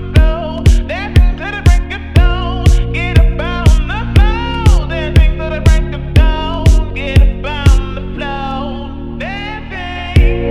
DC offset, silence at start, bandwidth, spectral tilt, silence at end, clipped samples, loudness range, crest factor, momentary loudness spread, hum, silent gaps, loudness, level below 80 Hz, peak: under 0.1%; 0 s; 11 kHz; -6.5 dB/octave; 0 s; 0.4%; 4 LU; 10 dB; 10 LU; none; none; -14 LUFS; -12 dBFS; 0 dBFS